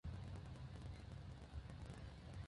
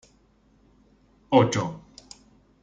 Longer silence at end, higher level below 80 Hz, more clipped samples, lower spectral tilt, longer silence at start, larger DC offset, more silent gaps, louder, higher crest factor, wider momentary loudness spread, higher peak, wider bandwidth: second, 0 s vs 0.85 s; about the same, -58 dBFS vs -60 dBFS; neither; about the same, -6.5 dB/octave vs -6 dB/octave; second, 0.05 s vs 1.3 s; neither; neither; second, -55 LUFS vs -23 LUFS; second, 14 dB vs 24 dB; second, 3 LU vs 26 LU; second, -38 dBFS vs -4 dBFS; first, 11 kHz vs 9.4 kHz